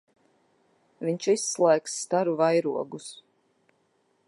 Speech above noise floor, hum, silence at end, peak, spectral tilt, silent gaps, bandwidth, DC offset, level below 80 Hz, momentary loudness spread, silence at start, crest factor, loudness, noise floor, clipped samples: 44 dB; none; 1.15 s; -8 dBFS; -4 dB/octave; none; 11.5 kHz; under 0.1%; -84 dBFS; 13 LU; 1 s; 20 dB; -26 LUFS; -70 dBFS; under 0.1%